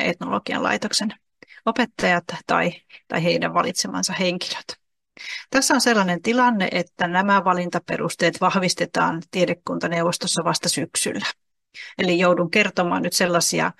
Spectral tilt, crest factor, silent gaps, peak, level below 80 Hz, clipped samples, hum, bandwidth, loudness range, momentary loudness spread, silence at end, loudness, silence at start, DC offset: -3.5 dB/octave; 18 dB; none; -4 dBFS; -62 dBFS; under 0.1%; none; 12.5 kHz; 3 LU; 10 LU; 0.05 s; -21 LUFS; 0 s; under 0.1%